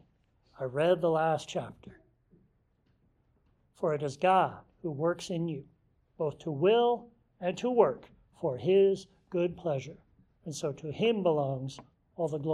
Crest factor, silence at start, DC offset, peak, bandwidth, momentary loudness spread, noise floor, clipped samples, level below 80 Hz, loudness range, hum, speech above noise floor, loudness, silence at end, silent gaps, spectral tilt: 22 dB; 0.6 s; under 0.1%; -10 dBFS; 11.5 kHz; 15 LU; -71 dBFS; under 0.1%; -68 dBFS; 5 LU; none; 41 dB; -30 LUFS; 0 s; none; -6.5 dB/octave